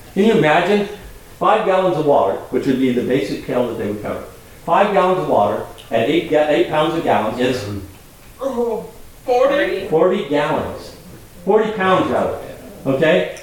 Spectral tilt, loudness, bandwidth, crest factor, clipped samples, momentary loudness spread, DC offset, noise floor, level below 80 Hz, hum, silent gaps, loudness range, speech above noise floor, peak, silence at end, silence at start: -6 dB/octave; -17 LUFS; 18 kHz; 16 dB; under 0.1%; 13 LU; 0.2%; -41 dBFS; -46 dBFS; none; none; 3 LU; 25 dB; -2 dBFS; 0 s; 0 s